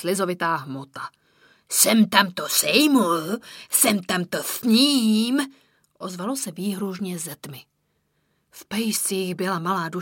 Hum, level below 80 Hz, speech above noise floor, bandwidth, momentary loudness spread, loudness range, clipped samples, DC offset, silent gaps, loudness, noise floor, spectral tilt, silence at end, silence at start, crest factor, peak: none; -70 dBFS; 48 dB; 17 kHz; 17 LU; 10 LU; under 0.1%; under 0.1%; none; -21 LUFS; -71 dBFS; -3 dB/octave; 0 s; 0 s; 22 dB; 0 dBFS